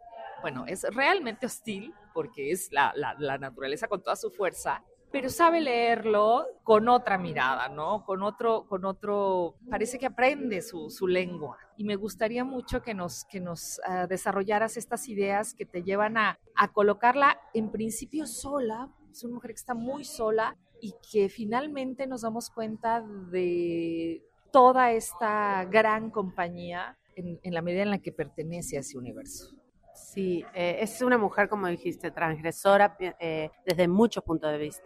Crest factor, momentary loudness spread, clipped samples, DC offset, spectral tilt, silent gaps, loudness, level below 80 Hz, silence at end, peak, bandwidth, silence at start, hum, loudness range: 22 dB; 14 LU; under 0.1%; under 0.1%; -4.5 dB/octave; none; -28 LUFS; -58 dBFS; 0.1 s; -8 dBFS; 15.5 kHz; 0 s; none; 7 LU